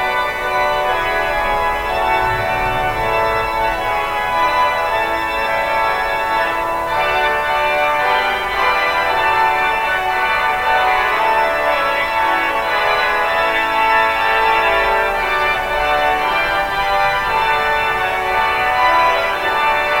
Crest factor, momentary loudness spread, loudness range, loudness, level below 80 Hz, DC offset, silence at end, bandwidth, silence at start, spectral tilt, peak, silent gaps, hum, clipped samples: 14 dB; 4 LU; 2 LU; -15 LUFS; -36 dBFS; under 0.1%; 0 s; 19 kHz; 0 s; -3 dB/octave; -2 dBFS; none; none; under 0.1%